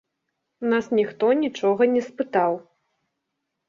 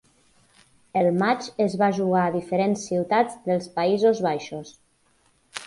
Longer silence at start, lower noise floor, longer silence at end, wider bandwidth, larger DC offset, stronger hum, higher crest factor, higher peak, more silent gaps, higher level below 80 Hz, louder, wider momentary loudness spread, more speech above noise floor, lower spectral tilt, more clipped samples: second, 0.6 s vs 0.95 s; first, -80 dBFS vs -64 dBFS; first, 1.05 s vs 0 s; second, 7.4 kHz vs 11.5 kHz; neither; neither; about the same, 18 dB vs 16 dB; about the same, -6 dBFS vs -8 dBFS; neither; second, -70 dBFS vs -64 dBFS; about the same, -22 LUFS vs -23 LUFS; second, 5 LU vs 9 LU; first, 58 dB vs 41 dB; about the same, -6 dB/octave vs -6 dB/octave; neither